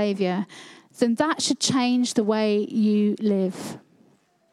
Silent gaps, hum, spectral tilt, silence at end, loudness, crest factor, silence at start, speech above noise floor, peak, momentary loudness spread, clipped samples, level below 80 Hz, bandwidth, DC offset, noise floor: none; none; -4.5 dB/octave; 0.75 s; -23 LUFS; 18 dB; 0 s; 39 dB; -6 dBFS; 15 LU; under 0.1%; -72 dBFS; 13 kHz; under 0.1%; -61 dBFS